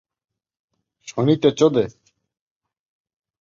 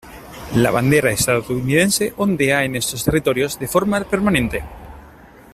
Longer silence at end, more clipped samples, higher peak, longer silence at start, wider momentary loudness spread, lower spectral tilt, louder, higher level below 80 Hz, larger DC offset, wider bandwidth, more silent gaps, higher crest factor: first, 1.5 s vs 0.45 s; neither; about the same, -4 dBFS vs -2 dBFS; first, 1.05 s vs 0.05 s; first, 12 LU vs 8 LU; first, -6.5 dB/octave vs -4.5 dB/octave; about the same, -19 LUFS vs -18 LUFS; second, -60 dBFS vs -40 dBFS; neither; second, 7.6 kHz vs 16 kHz; neither; about the same, 20 dB vs 16 dB